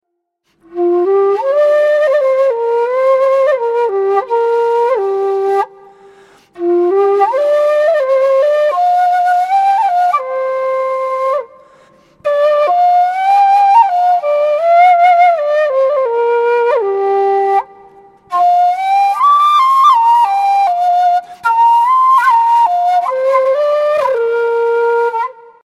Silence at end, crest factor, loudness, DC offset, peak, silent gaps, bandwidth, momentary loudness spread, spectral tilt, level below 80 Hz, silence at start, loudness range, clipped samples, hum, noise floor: 0.4 s; 12 dB; -12 LUFS; under 0.1%; 0 dBFS; none; 13.5 kHz; 7 LU; -3.5 dB/octave; -66 dBFS; 0.7 s; 5 LU; under 0.1%; none; -66 dBFS